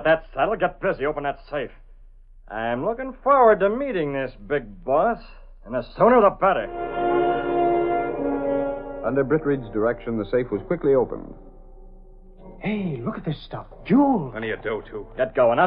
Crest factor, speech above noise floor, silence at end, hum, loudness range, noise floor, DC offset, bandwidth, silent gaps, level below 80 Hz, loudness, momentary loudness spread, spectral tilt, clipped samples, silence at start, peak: 18 dB; 24 dB; 0 s; none; 6 LU; -46 dBFS; under 0.1%; 5.2 kHz; none; -44 dBFS; -23 LUFS; 14 LU; -11 dB/octave; under 0.1%; 0 s; -4 dBFS